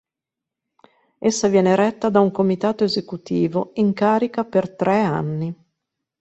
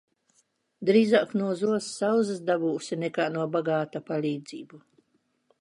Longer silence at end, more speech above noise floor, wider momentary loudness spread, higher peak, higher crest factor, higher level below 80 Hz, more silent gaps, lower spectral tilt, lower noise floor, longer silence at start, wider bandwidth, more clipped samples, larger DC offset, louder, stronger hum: second, 0.65 s vs 0.85 s; first, 67 dB vs 46 dB; about the same, 8 LU vs 9 LU; first, -4 dBFS vs -8 dBFS; about the same, 18 dB vs 18 dB; first, -60 dBFS vs -80 dBFS; neither; about the same, -6 dB/octave vs -5.5 dB/octave; first, -86 dBFS vs -72 dBFS; first, 1.2 s vs 0.8 s; second, 8.2 kHz vs 11 kHz; neither; neither; first, -20 LUFS vs -27 LUFS; neither